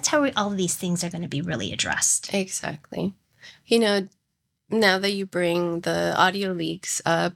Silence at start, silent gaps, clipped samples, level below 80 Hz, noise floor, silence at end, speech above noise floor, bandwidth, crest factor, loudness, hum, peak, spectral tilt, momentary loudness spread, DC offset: 0 s; none; under 0.1%; -62 dBFS; -77 dBFS; 0.05 s; 53 dB; 17.5 kHz; 20 dB; -24 LUFS; none; -4 dBFS; -3 dB/octave; 10 LU; under 0.1%